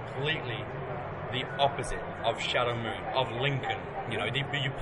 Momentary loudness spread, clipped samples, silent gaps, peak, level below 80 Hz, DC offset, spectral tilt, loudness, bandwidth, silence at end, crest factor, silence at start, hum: 8 LU; under 0.1%; none; -12 dBFS; -52 dBFS; under 0.1%; -5 dB/octave; -31 LUFS; 11 kHz; 0 s; 20 dB; 0 s; none